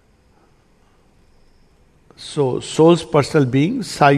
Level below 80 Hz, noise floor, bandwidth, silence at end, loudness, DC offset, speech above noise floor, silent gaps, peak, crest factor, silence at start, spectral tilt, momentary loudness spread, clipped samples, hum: -52 dBFS; -55 dBFS; 13.5 kHz; 0 s; -17 LUFS; under 0.1%; 39 dB; none; 0 dBFS; 18 dB; 2.2 s; -6 dB/octave; 9 LU; under 0.1%; none